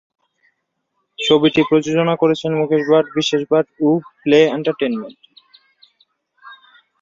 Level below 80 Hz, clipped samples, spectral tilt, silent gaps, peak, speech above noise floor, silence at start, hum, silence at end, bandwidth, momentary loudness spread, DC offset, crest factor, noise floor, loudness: -60 dBFS; under 0.1%; -5.5 dB/octave; none; -2 dBFS; 56 dB; 1.2 s; none; 0.45 s; 7.6 kHz; 8 LU; under 0.1%; 16 dB; -72 dBFS; -16 LUFS